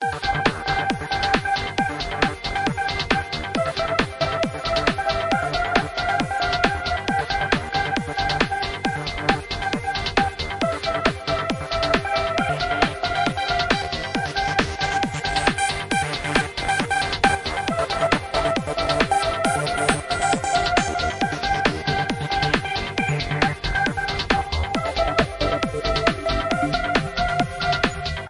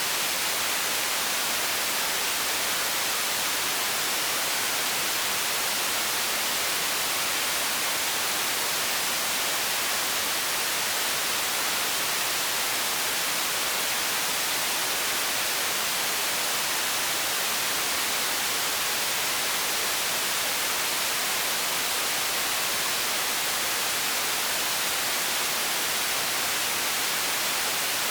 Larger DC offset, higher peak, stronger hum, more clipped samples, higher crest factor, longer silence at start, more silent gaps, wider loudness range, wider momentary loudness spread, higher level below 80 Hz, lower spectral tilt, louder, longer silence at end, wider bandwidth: neither; first, -2 dBFS vs -14 dBFS; neither; neither; first, 22 dB vs 14 dB; about the same, 0 s vs 0 s; neither; about the same, 2 LU vs 0 LU; first, 4 LU vs 0 LU; first, -36 dBFS vs -62 dBFS; first, -4 dB/octave vs 0.5 dB/octave; about the same, -22 LUFS vs -24 LUFS; about the same, 0 s vs 0 s; second, 11.5 kHz vs over 20 kHz